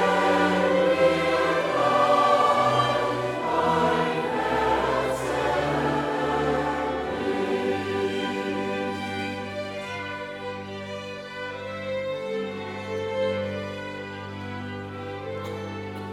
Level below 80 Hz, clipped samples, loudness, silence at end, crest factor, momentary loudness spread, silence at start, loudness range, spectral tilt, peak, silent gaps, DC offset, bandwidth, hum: -52 dBFS; under 0.1%; -25 LUFS; 0 s; 16 dB; 14 LU; 0 s; 11 LU; -5.5 dB/octave; -8 dBFS; none; under 0.1%; 15.5 kHz; none